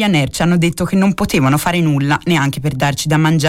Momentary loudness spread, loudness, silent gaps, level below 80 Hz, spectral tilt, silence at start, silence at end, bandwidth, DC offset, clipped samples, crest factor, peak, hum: 3 LU; -15 LUFS; none; -38 dBFS; -5.5 dB/octave; 0 s; 0 s; 16.5 kHz; under 0.1%; under 0.1%; 10 dB; -4 dBFS; none